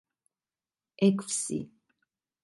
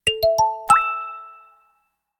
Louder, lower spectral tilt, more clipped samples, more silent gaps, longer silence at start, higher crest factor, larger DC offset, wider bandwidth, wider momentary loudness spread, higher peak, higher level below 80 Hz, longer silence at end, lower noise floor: second, -29 LUFS vs -19 LUFS; first, -5 dB/octave vs -1.5 dB/octave; neither; neither; first, 1 s vs 0.05 s; about the same, 22 dB vs 20 dB; neither; second, 11.5 kHz vs 18 kHz; second, 12 LU vs 17 LU; second, -12 dBFS vs -4 dBFS; second, -74 dBFS vs -50 dBFS; about the same, 0.75 s vs 0.85 s; first, under -90 dBFS vs -68 dBFS